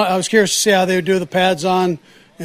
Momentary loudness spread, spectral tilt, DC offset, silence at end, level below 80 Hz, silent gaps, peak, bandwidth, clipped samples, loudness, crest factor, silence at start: 5 LU; -3.5 dB/octave; under 0.1%; 0 s; -58 dBFS; none; 0 dBFS; 16 kHz; under 0.1%; -15 LUFS; 16 dB; 0 s